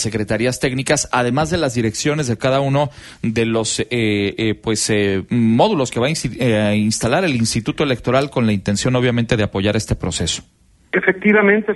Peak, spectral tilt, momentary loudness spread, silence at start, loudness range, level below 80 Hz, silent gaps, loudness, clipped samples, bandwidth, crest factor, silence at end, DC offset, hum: 0 dBFS; -5 dB/octave; 5 LU; 0 s; 2 LU; -40 dBFS; none; -17 LUFS; under 0.1%; 12 kHz; 18 dB; 0 s; under 0.1%; none